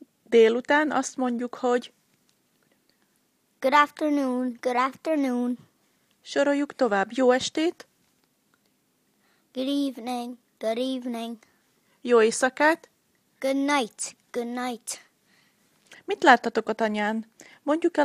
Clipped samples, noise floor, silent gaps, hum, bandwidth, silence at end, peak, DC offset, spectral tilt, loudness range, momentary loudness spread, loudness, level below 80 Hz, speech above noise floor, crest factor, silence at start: under 0.1%; -69 dBFS; none; none; 15 kHz; 0 s; -2 dBFS; under 0.1%; -3 dB/octave; 7 LU; 15 LU; -25 LUFS; -76 dBFS; 45 dB; 26 dB; 0.3 s